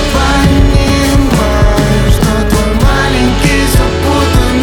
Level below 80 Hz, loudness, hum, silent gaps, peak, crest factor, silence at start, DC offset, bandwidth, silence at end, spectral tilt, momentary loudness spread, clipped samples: -12 dBFS; -10 LUFS; none; none; 0 dBFS; 8 dB; 0 s; under 0.1%; 19 kHz; 0 s; -5.5 dB/octave; 2 LU; under 0.1%